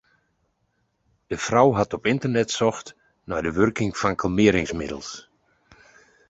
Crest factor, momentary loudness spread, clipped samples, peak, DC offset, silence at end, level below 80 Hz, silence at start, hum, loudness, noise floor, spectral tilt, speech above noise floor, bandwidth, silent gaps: 22 dB; 15 LU; under 0.1%; -4 dBFS; under 0.1%; 1.1 s; -48 dBFS; 1.3 s; none; -22 LUFS; -71 dBFS; -5.5 dB/octave; 49 dB; 8.2 kHz; none